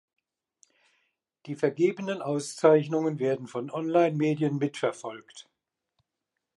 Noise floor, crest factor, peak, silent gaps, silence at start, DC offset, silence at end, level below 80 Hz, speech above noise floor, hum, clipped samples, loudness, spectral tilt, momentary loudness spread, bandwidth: -85 dBFS; 20 dB; -8 dBFS; none; 1.45 s; under 0.1%; 1.15 s; -82 dBFS; 58 dB; none; under 0.1%; -27 LUFS; -6.5 dB/octave; 13 LU; 11.5 kHz